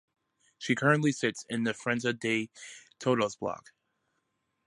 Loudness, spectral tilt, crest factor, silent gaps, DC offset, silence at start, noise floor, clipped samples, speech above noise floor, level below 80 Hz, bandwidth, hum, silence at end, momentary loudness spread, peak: -30 LUFS; -5 dB/octave; 22 dB; none; under 0.1%; 0.6 s; -79 dBFS; under 0.1%; 49 dB; -72 dBFS; 11.5 kHz; none; 1.05 s; 16 LU; -10 dBFS